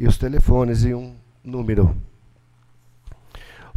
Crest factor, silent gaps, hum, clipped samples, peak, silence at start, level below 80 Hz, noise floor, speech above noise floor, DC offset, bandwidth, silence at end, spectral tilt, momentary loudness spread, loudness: 18 dB; none; 60 Hz at -45 dBFS; under 0.1%; -2 dBFS; 0 s; -24 dBFS; -54 dBFS; 37 dB; under 0.1%; 12 kHz; 0.35 s; -8 dB/octave; 21 LU; -21 LUFS